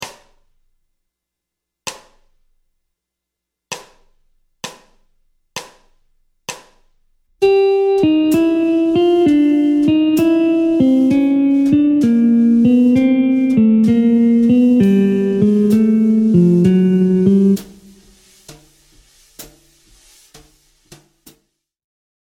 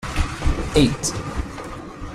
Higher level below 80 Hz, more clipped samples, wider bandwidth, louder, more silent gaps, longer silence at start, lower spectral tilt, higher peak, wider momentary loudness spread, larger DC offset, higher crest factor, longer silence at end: second, -52 dBFS vs -28 dBFS; neither; first, 16 kHz vs 14.5 kHz; first, -13 LUFS vs -22 LUFS; neither; about the same, 0 s vs 0 s; first, -7.5 dB/octave vs -5 dB/octave; about the same, 0 dBFS vs -2 dBFS; first, 19 LU vs 15 LU; neither; second, 14 dB vs 20 dB; first, 2.8 s vs 0 s